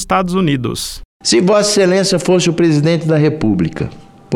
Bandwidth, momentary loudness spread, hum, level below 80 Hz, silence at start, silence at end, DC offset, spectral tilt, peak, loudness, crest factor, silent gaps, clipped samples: 16 kHz; 10 LU; none; -38 dBFS; 0 s; 0 s; under 0.1%; -5 dB/octave; 0 dBFS; -13 LUFS; 12 dB; 1.05-1.20 s; under 0.1%